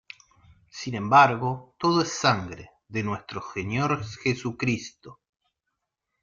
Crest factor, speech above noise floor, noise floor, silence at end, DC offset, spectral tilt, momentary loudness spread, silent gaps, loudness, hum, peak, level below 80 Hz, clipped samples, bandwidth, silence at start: 22 dB; 57 dB; -82 dBFS; 1.1 s; under 0.1%; -5 dB/octave; 18 LU; none; -25 LUFS; none; -4 dBFS; -60 dBFS; under 0.1%; 7.6 kHz; 0.75 s